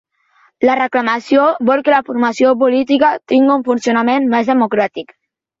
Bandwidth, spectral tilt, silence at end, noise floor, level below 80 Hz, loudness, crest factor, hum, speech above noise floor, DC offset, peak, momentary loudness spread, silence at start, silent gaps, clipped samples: 7.8 kHz; -5 dB/octave; 0.55 s; -55 dBFS; -60 dBFS; -14 LUFS; 14 dB; none; 41 dB; under 0.1%; 0 dBFS; 4 LU; 0.6 s; none; under 0.1%